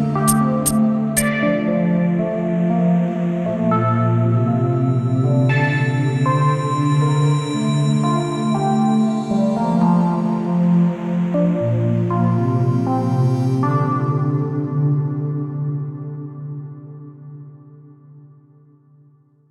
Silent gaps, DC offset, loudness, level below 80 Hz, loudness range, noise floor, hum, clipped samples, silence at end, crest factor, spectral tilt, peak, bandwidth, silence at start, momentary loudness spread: none; under 0.1%; -18 LUFS; -50 dBFS; 8 LU; -52 dBFS; none; under 0.1%; 1.25 s; 16 dB; -7 dB/octave; -2 dBFS; 14 kHz; 0 s; 8 LU